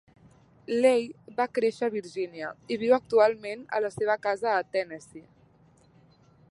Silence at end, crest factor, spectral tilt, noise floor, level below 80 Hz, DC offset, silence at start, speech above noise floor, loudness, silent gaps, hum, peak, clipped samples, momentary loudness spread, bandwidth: 1.3 s; 20 dB; -5 dB/octave; -60 dBFS; -70 dBFS; under 0.1%; 0.7 s; 33 dB; -27 LUFS; none; none; -8 dBFS; under 0.1%; 13 LU; 11.5 kHz